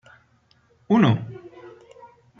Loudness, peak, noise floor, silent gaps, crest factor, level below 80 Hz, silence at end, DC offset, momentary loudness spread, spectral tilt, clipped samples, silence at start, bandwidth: -20 LUFS; -6 dBFS; -61 dBFS; none; 20 dB; -64 dBFS; 0.7 s; under 0.1%; 26 LU; -8.5 dB/octave; under 0.1%; 0.9 s; 6.8 kHz